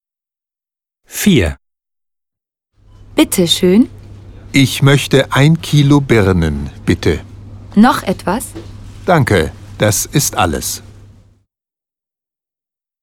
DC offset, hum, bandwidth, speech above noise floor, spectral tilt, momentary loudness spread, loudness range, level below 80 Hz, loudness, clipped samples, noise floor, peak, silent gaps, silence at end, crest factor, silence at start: under 0.1%; none; 18 kHz; 78 dB; -5 dB/octave; 11 LU; 7 LU; -34 dBFS; -13 LUFS; under 0.1%; -89 dBFS; 0 dBFS; none; 2.25 s; 14 dB; 1.1 s